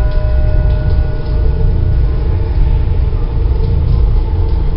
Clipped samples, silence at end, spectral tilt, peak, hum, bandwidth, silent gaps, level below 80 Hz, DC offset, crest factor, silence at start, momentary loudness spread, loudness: under 0.1%; 0 s; -13 dB/octave; 0 dBFS; none; 5.4 kHz; none; -12 dBFS; under 0.1%; 10 dB; 0 s; 2 LU; -15 LUFS